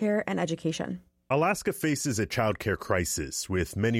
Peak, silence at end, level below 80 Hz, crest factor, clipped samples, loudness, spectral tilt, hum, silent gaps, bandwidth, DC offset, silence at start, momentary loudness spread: -12 dBFS; 0 s; -50 dBFS; 18 dB; under 0.1%; -29 LUFS; -4.5 dB/octave; none; none; 16.5 kHz; under 0.1%; 0 s; 5 LU